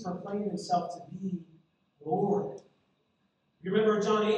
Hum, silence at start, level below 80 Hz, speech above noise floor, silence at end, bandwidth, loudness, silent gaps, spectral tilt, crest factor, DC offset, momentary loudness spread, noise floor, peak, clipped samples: none; 0 s; -74 dBFS; 45 dB; 0 s; 9.8 kHz; -31 LUFS; none; -6 dB/octave; 18 dB; under 0.1%; 15 LU; -74 dBFS; -14 dBFS; under 0.1%